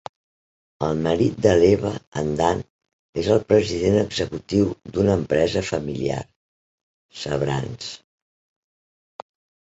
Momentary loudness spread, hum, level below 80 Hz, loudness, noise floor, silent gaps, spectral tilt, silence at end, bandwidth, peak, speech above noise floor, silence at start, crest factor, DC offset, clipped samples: 14 LU; none; -44 dBFS; -22 LUFS; under -90 dBFS; 2.07-2.12 s, 2.70-2.79 s, 2.93-3.13 s, 6.36-7.09 s; -6 dB/octave; 1.75 s; 8.2 kHz; -4 dBFS; over 69 dB; 0.8 s; 20 dB; under 0.1%; under 0.1%